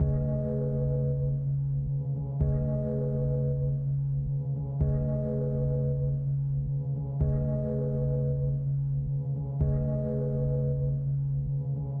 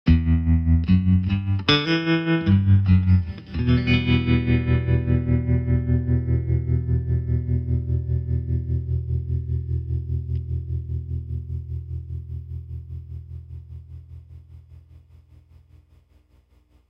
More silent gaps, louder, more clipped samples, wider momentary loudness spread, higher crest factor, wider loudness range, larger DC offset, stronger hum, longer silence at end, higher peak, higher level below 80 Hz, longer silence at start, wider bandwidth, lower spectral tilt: neither; second, -30 LUFS vs -22 LUFS; neither; second, 3 LU vs 16 LU; second, 14 dB vs 20 dB; second, 0 LU vs 17 LU; neither; second, none vs 60 Hz at -55 dBFS; second, 0 s vs 2.1 s; second, -14 dBFS vs -2 dBFS; second, -38 dBFS vs -30 dBFS; about the same, 0 s vs 0.05 s; second, 1.7 kHz vs 6.2 kHz; first, -14 dB/octave vs -8.5 dB/octave